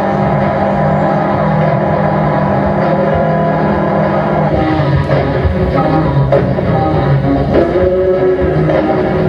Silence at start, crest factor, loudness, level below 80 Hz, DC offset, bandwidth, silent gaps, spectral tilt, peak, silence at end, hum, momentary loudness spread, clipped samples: 0 s; 12 dB; -12 LUFS; -28 dBFS; under 0.1%; 6.4 kHz; none; -9.5 dB/octave; 0 dBFS; 0 s; none; 1 LU; under 0.1%